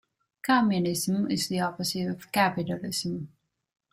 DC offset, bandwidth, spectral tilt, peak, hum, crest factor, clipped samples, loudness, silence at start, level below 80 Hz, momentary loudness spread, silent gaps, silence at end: under 0.1%; 16 kHz; -4.5 dB/octave; -10 dBFS; none; 20 dB; under 0.1%; -27 LUFS; 0.45 s; -66 dBFS; 11 LU; none; 0.65 s